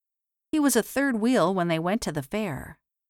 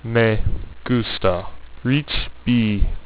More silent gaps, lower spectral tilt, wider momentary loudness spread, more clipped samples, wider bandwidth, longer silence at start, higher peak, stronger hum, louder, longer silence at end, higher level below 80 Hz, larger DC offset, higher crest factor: neither; second, -5 dB/octave vs -10.5 dB/octave; about the same, 9 LU vs 10 LU; neither; first, 18 kHz vs 4 kHz; first, 0.55 s vs 0.05 s; second, -8 dBFS vs -2 dBFS; neither; second, -25 LUFS vs -21 LUFS; first, 0.35 s vs 0 s; second, -56 dBFS vs -28 dBFS; neither; about the same, 18 dB vs 16 dB